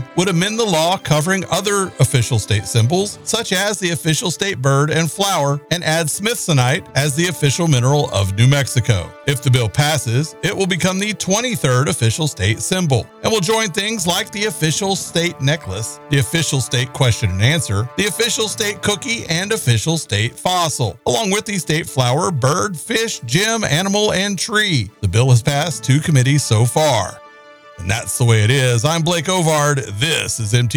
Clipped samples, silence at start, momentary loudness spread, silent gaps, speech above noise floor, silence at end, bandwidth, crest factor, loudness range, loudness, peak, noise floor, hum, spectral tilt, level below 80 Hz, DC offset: under 0.1%; 0 s; 5 LU; none; 25 dB; 0 s; over 20 kHz; 14 dB; 2 LU; -17 LUFS; -2 dBFS; -42 dBFS; none; -4 dB/octave; -46 dBFS; under 0.1%